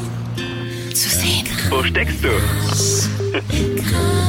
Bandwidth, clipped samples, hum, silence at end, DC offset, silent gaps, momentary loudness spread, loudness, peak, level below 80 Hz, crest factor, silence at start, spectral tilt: 17 kHz; under 0.1%; none; 0 s; under 0.1%; none; 9 LU; -18 LUFS; -6 dBFS; -30 dBFS; 12 dB; 0 s; -3.5 dB/octave